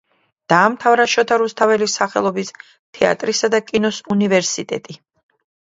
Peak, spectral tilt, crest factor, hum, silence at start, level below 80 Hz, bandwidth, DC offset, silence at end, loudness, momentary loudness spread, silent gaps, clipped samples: 0 dBFS; -3.5 dB/octave; 18 dB; none; 0.5 s; -60 dBFS; 7.8 kHz; under 0.1%; 0.7 s; -17 LUFS; 9 LU; 2.79-2.93 s; under 0.1%